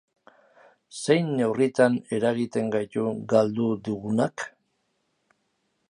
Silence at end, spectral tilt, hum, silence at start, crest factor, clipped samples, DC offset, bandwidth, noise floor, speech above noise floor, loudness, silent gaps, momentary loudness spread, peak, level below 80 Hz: 1.4 s; -6 dB/octave; none; 0.95 s; 20 dB; under 0.1%; under 0.1%; 11 kHz; -74 dBFS; 50 dB; -25 LUFS; none; 9 LU; -6 dBFS; -70 dBFS